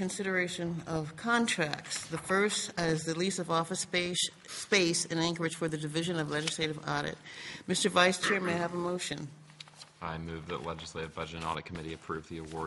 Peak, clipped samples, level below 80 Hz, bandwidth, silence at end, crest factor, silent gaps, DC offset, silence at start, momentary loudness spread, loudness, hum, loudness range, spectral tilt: -8 dBFS; under 0.1%; -64 dBFS; 11.5 kHz; 0 s; 24 dB; none; under 0.1%; 0 s; 14 LU; -32 LUFS; none; 7 LU; -3.5 dB/octave